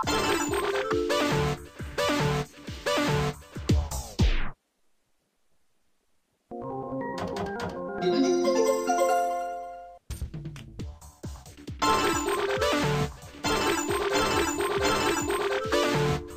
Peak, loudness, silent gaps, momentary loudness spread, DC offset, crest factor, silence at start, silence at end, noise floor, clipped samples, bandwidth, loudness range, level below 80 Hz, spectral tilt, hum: -12 dBFS; -27 LUFS; none; 17 LU; under 0.1%; 16 dB; 0 s; 0 s; -74 dBFS; under 0.1%; 15.5 kHz; 8 LU; -40 dBFS; -4.5 dB/octave; none